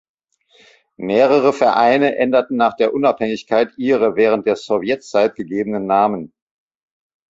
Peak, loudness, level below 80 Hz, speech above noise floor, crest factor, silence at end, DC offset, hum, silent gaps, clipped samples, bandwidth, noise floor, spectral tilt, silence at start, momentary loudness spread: -2 dBFS; -16 LUFS; -60 dBFS; 39 dB; 16 dB; 1.05 s; under 0.1%; none; none; under 0.1%; 7.8 kHz; -54 dBFS; -6 dB/octave; 1 s; 8 LU